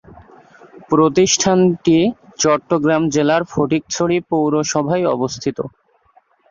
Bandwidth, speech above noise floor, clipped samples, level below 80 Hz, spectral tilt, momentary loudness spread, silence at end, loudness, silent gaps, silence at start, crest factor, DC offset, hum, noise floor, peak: 7.6 kHz; 40 dB; under 0.1%; -52 dBFS; -4.5 dB/octave; 8 LU; 0.85 s; -16 LUFS; none; 0.9 s; 16 dB; under 0.1%; none; -55 dBFS; -2 dBFS